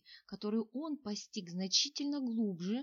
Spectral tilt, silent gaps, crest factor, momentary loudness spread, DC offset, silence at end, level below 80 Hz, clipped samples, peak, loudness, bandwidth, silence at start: -3.5 dB/octave; none; 20 dB; 12 LU; under 0.1%; 0 s; -84 dBFS; under 0.1%; -18 dBFS; -36 LUFS; 7.4 kHz; 0.1 s